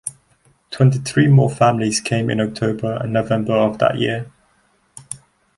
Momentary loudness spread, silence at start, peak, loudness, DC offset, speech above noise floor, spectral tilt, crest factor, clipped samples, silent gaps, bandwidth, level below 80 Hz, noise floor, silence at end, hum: 19 LU; 0.05 s; -2 dBFS; -18 LUFS; under 0.1%; 43 dB; -6 dB/octave; 16 dB; under 0.1%; none; 11.5 kHz; -52 dBFS; -60 dBFS; 0.4 s; none